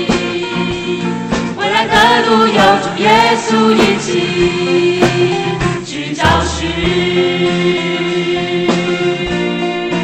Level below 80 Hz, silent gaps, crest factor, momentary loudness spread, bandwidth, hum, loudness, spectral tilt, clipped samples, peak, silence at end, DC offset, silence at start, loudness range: -34 dBFS; none; 14 dB; 8 LU; 12 kHz; none; -13 LUFS; -5 dB/octave; under 0.1%; 0 dBFS; 0 s; under 0.1%; 0 s; 4 LU